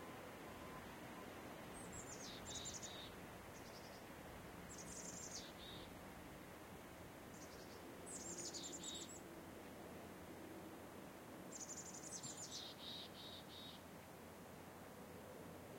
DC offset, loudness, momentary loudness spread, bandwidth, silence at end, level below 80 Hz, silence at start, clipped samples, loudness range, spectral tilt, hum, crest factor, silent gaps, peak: under 0.1%; -53 LUFS; 8 LU; 16.5 kHz; 0 s; -72 dBFS; 0 s; under 0.1%; 2 LU; -3 dB/octave; none; 16 dB; none; -38 dBFS